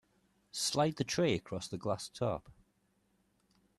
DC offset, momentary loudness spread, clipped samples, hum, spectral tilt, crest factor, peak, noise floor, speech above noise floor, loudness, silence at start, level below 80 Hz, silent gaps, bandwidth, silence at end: under 0.1%; 10 LU; under 0.1%; 50 Hz at -60 dBFS; -4.5 dB/octave; 20 dB; -18 dBFS; -75 dBFS; 41 dB; -35 LUFS; 0.55 s; -66 dBFS; none; 13.5 kHz; 1.25 s